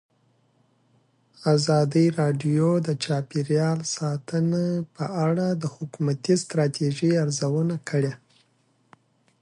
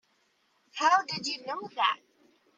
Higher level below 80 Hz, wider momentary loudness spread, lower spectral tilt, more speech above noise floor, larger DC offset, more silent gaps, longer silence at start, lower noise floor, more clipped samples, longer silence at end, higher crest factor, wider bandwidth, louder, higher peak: first, -68 dBFS vs -84 dBFS; second, 8 LU vs 13 LU; first, -6.5 dB/octave vs -1.5 dB/octave; about the same, 43 dB vs 42 dB; neither; neither; first, 1.4 s vs 0.75 s; second, -66 dBFS vs -71 dBFS; neither; first, 1.25 s vs 0.6 s; about the same, 16 dB vs 20 dB; first, 11 kHz vs 9.4 kHz; first, -24 LUFS vs -29 LUFS; about the same, -8 dBFS vs -10 dBFS